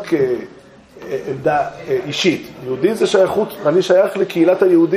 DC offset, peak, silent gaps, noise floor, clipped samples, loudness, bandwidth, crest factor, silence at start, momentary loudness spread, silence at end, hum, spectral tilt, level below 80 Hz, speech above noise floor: under 0.1%; -2 dBFS; none; -38 dBFS; under 0.1%; -17 LUFS; 15.5 kHz; 14 dB; 0 s; 12 LU; 0 s; none; -5.5 dB/octave; -56 dBFS; 22 dB